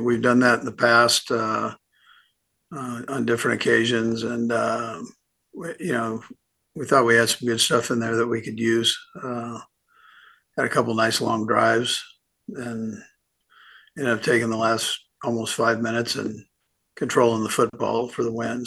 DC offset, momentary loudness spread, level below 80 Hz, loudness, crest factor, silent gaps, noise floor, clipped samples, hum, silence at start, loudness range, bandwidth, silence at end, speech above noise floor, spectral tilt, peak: under 0.1%; 16 LU; -66 dBFS; -22 LUFS; 20 dB; none; -69 dBFS; under 0.1%; none; 0 s; 4 LU; 12.5 kHz; 0 s; 46 dB; -3.5 dB/octave; -4 dBFS